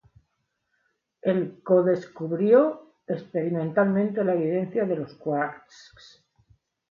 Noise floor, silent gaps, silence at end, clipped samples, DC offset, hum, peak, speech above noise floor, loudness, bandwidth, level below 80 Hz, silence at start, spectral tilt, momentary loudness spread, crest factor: -77 dBFS; none; 1.35 s; under 0.1%; under 0.1%; none; -8 dBFS; 52 dB; -25 LUFS; 7.2 kHz; -70 dBFS; 1.25 s; -9 dB/octave; 12 LU; 18 dB